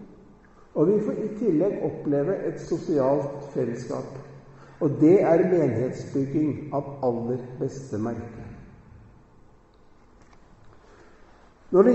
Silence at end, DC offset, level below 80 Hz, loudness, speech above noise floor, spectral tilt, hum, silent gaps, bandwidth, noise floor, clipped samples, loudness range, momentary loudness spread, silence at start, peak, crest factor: 0 s; under 0.1%; -56 dBFS; -25 LUFS; 30 dB; -9 dB/octave; none; none; 8.2 kHz; -54 dBFS; under 0.1%; 12 LU; 14 LU; 0 s; -6 dBFS; 20 dB